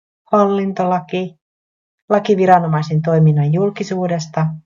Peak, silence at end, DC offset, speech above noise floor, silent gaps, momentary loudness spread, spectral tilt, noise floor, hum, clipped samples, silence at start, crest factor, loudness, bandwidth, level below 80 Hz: 0 dBFS; 0.05 s; under 0.1%; over 75 dB; 1.41-2.08 s; 8 LU; -8 dB/octave; under -90 dBFS; none; under 0.1%; 0.3 s; 16 dB; -16 LUFS; 7.4 kHz; -56 dBFS